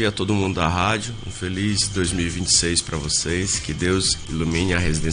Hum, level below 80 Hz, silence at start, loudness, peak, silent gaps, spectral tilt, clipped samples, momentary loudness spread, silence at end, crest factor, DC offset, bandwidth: none; -36 dBFS; 0 s; -21 LUFS; -4 dBFS; none; -3.5 dB/octave; under 0.1%; 7 LU; 0 s; 16 dB; under 0.1%; 10.5 kHz